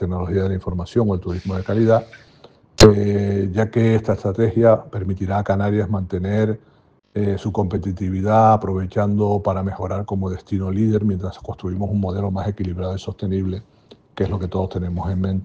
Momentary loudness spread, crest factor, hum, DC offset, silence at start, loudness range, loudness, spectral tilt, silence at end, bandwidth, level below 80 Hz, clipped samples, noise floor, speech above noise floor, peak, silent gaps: 10 LU; 20 dB; none; under 0.1%; 0 s; 7 LU; -20 LUFS; -7 dB/octave; 0 s; 9.6 kHz; -40 dBFS; under 0.1%; -49 dBFS; 30 dB; 0 dBFS; none